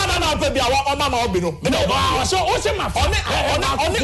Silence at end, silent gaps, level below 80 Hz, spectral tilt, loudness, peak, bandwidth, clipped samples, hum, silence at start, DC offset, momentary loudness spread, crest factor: 0 s; none; -30 dBFS; -3.5 dB/octave; -19 LUFS; -6 dBFS; 12.5 kHz; under 0.1%; none; 0 s; under 0.1%; 3 LU; 14 dB